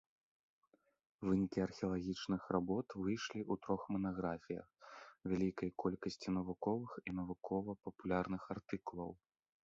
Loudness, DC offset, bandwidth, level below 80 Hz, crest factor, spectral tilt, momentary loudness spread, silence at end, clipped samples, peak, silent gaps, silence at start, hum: -42 LUFS; under 0.1%; 7.6 kHz; -66 dBFS; 20 dB; -6.5 dB/octave; 10 LU; 0.5 s; under 0.1%; -22 dBFS; none; 1.2 s; none